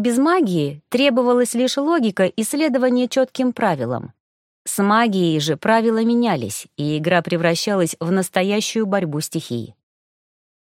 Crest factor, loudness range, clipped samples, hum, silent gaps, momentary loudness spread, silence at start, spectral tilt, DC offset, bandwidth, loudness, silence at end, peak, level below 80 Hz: 18 dB; 2 LU; under 0.1%; none; 4.20-4.65 s; 9 LU; 0 s; -5 dB/octave; under 0.1%; 16.5 kHz; -19 LUFS; 0.9 s; 0 dBFS; -66 dBFS